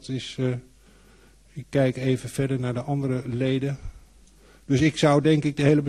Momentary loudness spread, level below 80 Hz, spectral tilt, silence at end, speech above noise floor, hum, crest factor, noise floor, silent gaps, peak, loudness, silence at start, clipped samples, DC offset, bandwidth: 14 LU; -50 dBFS; -6.5 dB/octave; 0 s; 31 dB; none; 18 dB; -54 dBFS; none; -6 dBFS; -24 LUFS; 0.05 s; under 0.1%; under 0.1%; 12.5 kHz